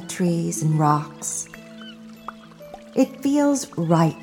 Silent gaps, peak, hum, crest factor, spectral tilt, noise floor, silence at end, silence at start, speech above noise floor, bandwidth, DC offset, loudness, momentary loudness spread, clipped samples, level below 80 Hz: none; -4 dBFS; none; 18 dB; -6 dB/octave; -42 dBFS; 0 s; 0 s; 21 dB; 17 kHz; under 0.1%; -22 LUFS; 20 LU; under 0.1%; -64 dBFS